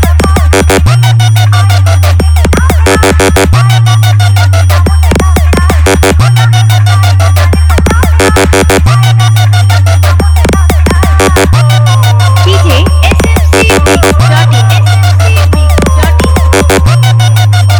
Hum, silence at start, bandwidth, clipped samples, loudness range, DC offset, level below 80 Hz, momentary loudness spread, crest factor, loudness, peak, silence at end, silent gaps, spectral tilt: none; 0 s; 19.5 kHz; 0.4%; 0 LU; under 0.1%; -10 dBFS; 1 LU; 4 dB; -6 LUFS; 0 dBFS; 0 s; none; -5.5 dB/octave